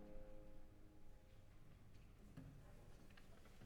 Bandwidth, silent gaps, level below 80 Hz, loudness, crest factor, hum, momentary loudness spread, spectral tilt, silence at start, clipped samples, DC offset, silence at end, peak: 17.5 kHz; none; -64 dBFS; -66 LUFS; 16 dB; none; 7 LU; -6.5 dB/octave; 0 s; under 0.1%; under 0.1%; 0 s; -42 dBFS